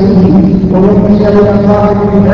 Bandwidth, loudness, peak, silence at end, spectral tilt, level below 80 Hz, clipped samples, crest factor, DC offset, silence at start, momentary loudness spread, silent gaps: 6 kHz; -7 LUFS; 0 dBFS; 0 s; -10.5 dB/octave; -24 dBFS; 3%; 6 dB; under 0.1%; 0 s; 2 LU; none